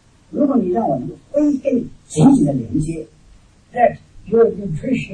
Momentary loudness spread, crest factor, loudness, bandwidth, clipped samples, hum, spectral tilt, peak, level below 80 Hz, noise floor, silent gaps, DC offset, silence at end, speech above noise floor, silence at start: 13 LU; 16 dB; -17 LUFS; 9.8 kHz; under 0.1%; none; -7.5 dB/octave; -2 dBFS; -42 dBFS; -48 dBFS; none; under 0.1%; 0 s; 31 dB; 0.3 s